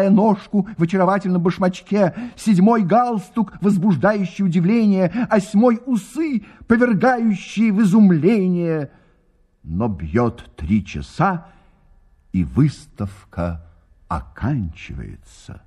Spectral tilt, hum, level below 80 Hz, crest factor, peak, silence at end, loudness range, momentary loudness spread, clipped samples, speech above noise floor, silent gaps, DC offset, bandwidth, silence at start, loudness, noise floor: -8 dB/octave; none; -42 dBFS; 16 dB; -2 dBFS; 0.1 s; 7 LU; 14 LU; under 0.1%; 40 dB; none; under 0.1%; 11.5 kHz; 0 s; -18 LUFS; -58 dBFS